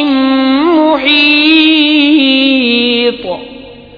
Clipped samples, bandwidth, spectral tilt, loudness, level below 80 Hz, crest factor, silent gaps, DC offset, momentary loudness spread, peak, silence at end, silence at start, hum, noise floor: 0.3%; 5.4 kHz; -5 dB/octave; -8 LUFS; -48 dBFS; 10 dB; none; under 0.1%; 8 LU; 0 dBFS; 0.15 s; 0 s; none; -31 dBFS